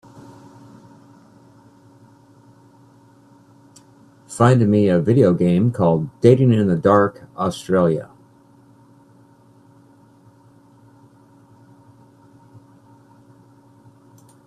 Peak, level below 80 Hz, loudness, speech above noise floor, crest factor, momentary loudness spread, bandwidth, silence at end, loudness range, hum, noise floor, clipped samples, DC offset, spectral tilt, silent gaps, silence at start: 0 dBFS; -58 dBFS; -17 LUFS; 35 dB; 22 dB; 11 LU; 12 kHz; 6.45 s; 10 LU; none; -51 dBFS; under 0.1%; under 0.1%; -8 dB/octave; none; 4.3 s